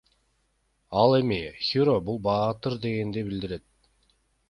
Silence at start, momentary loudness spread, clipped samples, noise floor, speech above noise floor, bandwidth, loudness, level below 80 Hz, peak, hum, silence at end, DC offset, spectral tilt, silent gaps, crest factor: 0.9 s; 11 LU; under 0.1%; -71 dBFS; 46 dB; 11 kHz; -26 LUFS; -54 dBFS; -6 dBFS; none; 0.9 s; under 0.1%; -8 dB/octave; none; 20 dB